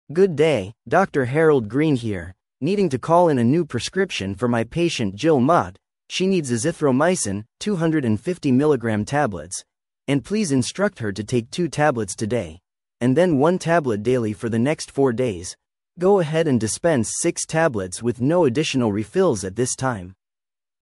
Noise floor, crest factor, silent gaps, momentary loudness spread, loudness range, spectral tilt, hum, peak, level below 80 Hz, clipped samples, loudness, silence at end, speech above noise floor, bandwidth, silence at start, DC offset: under -90 dBFS; 18 dB; none; 8 LU; 3 LU; -5.5 dB/octave; none; -4 dBFS; -54 dBFS; under 0.1%; -21 LUFS; 0.7 s; over 70 dB; 12 kHz; 0.1 s; under 0.1%